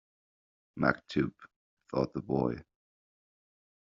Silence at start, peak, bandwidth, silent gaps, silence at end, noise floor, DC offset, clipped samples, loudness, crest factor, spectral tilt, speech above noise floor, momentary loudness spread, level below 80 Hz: 0.75 s; -10 dBFS; 7.4 kHz; 1.56-1.77 s; 1.2 s; under -90 dBFS; under 0.1%; under 0.1%; -33 LUFS; 26 dB; -6 dB/octave; over 58 dB; 8 LU; -62 dBFS